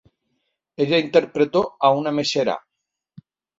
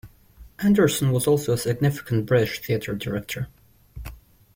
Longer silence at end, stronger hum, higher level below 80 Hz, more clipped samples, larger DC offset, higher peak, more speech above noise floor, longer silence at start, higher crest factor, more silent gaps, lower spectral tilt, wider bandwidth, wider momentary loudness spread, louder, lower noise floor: first, 1 s vs 0.4 s; neither; second, -64 dBFS vs -48 dBFS; neither; neither; first, -2 dBFS vs -8 dBFS; first, 62 dB vs 27 dB; first, 0.8 s vs 0.05 s; about the same, 20 dB vs 16 dB; neither; about the same, -5 dB/octave vs -6 dB/octave; second, 7.8 kHz vs 16.5 kHz; second, 7 LU vs 19 LU; first, -20 LUFS vs -23 LUFS; first, -81 dBFS vs -49 dBFS